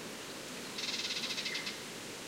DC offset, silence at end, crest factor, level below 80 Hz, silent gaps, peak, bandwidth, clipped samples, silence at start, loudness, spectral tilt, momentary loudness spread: under 0.1%; 0 s; 18 dB; -74 dBFS; none; -24 dBFS; 16 kHz; under 0.1%; 0 s; -38 LUFS; -1 dB/octave; 8 LU